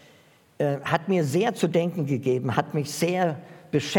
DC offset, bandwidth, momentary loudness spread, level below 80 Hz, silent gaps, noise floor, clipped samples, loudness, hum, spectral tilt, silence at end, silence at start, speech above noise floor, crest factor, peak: under 0.1%; 18 kHz; 5 LU; -70 dBFS; none; -57 dBFS; under 0.1%; -25 LUFS; none; -6 dB/octave; 0 s; 0.6 s; 32 dB; 20 dB; -4 dBFS